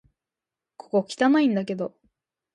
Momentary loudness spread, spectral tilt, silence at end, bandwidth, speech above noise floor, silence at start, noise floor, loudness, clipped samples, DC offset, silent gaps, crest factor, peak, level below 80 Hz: 12 LU; -6 dB/octave; 0.65 s; 11 kHz; 66 dB; 0.95 s; -89 dBFS; -24 LUFS; under 0.1%; under 0.1%; none; 18 dB; -8 dBFS; -74 dBFS